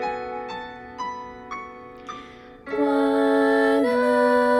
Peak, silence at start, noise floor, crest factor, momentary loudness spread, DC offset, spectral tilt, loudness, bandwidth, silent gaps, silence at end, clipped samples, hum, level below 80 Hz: -8 dBFS; 0 s; -43 dBFS; 14 dB; 20 LU; under 0.1%; -5 dB/octave; -22 LUFS; 15.5 kHz; none; 0 s; under 0.1%; none; -58 dBFS